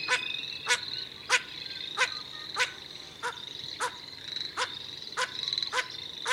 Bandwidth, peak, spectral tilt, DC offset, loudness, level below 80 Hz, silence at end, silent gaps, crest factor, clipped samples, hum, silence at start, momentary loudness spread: 16.5 kHz; -10 dBFS; 0.5 dB/octave; under 0.1%; -32 LUFS; -70 dBFS; 0 s; none; 24 dB; under 0.1%; none; 0 s; 10 LU